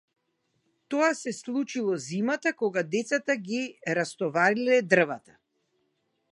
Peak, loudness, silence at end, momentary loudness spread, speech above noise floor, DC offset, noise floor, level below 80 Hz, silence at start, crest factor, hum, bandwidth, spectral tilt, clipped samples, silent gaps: -6 dBFS; -27 LUFS; 1.15 s; 9 LU; 49 dB; under 0.1%; -75 dBFS; -80 dBFS; 0.9 s; 22 dB; none; 11.5 kHz; -4.5 dB/octave; under 0.1%; none